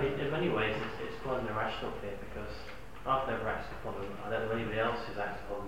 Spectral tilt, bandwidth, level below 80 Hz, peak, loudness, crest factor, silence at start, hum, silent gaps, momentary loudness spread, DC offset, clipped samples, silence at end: -6.5 dB/octave; 16 kHz; -52 dBFS; -18 dBFS; -36 LUFS; 18 dB; 0 s; none; none; 11 LU; 0.6%; under 0.1%; 0 s